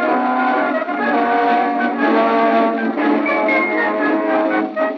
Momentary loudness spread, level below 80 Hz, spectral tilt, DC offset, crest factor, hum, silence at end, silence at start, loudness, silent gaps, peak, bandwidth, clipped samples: 4 LU; -78 dBFS; -6.5 dB/octave; under 0.1%; 12 dB; none; 0 s; 0 s; -16 LUFS; none; -4 dBFS; 6.2 kHz; under 0.1%